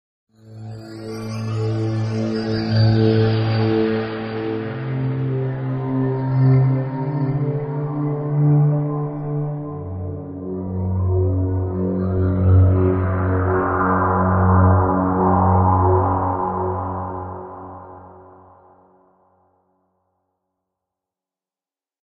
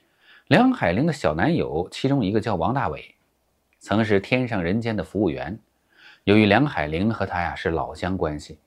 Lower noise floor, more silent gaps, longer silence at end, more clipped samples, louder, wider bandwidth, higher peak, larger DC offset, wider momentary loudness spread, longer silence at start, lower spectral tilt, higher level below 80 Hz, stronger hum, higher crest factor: first, under -90 dBFS vs -68 dBFS; neither; first, 3.8 s vs 0.1 s; neither; about the same, -20 LUFS vs -22 LUFS; second, 6.2 kHz vs 12 kHz; second, -4 dBFS vs 0 dBFS; neither; first, 14 LU vs 10 LU; about the same, 0.45 s vs 0.5 s; first, -9.5 dB/octave vs -7 dB/octave; about the same, -42 dBFS vs -46 dBFS; neither; second, 16 dB vs 22 dB